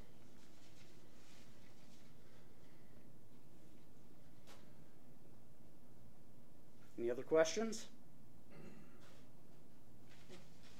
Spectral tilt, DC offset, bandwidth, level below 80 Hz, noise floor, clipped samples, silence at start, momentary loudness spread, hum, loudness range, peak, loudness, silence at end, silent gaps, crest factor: -4 dB/octave; 0.6%; 16 kHz; -78 dBFS; -66 dBFS; under 0.1%; 1.4 s; 23 LU; none; 22 LU; -22 dBFS; -40 LUFS; 0.1 s; none; 28 dB